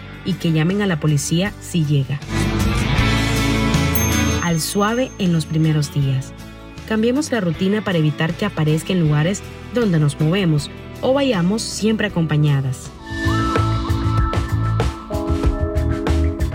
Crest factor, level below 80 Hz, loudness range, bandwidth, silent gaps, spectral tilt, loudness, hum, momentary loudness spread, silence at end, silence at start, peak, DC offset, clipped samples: 14 dB; -28 dBFS; 2 LU; 16.5 kHz; none; -5.5 dB/octave; -19 LUFS; none; 6 LU; 0 s; 0 s; -4 dBFS; under 0.1%; under 0.1%